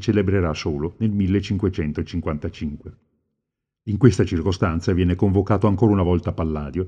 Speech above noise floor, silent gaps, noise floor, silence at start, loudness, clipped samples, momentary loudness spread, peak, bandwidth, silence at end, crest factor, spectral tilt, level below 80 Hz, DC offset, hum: 62 dB; none; -82 dBFS; 0 s; -21 LUFS; under 0.1%; 10 LU; 0 dBFS; 9 kHz; 0 s; 20 dB; -8 dB/octave; -38 dBFS; under 0.1%; none